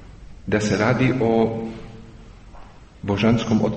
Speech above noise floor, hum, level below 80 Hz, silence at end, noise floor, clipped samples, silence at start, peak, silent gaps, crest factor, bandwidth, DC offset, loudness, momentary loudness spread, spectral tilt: 23 dB; none; -44 dBFS; 0 s; -42 dBFS; under 0.1%; 0 s; -6 dBFS; none; 16 dB; 8.4 kHz; under 0.1%; -20 LUFS; 18 LU; -6.5 dB/octave